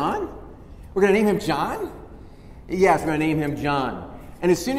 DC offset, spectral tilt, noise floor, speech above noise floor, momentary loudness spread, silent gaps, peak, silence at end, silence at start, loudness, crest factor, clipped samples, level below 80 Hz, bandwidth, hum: under 0.1%; -6 dB/octave; -42 dBFS; 21 dB; 16 LU; none; -4 dBFS; 0 s; 0 s; -22 LUFS; 18 dB; under 0.1%; -44 dBFS; 15.5 kHz; none